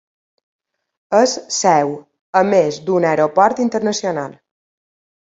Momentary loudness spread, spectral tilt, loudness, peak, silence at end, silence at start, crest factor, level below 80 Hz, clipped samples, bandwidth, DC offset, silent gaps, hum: 9 LU; -4 dB/octave; -16 LUFS; 0 dBFS; 0.9 s; 1.1 s; 18 dB; -64 dBFS; under 0.1%; 8 kHz; under 0.1%; 2.21-2.33 s; none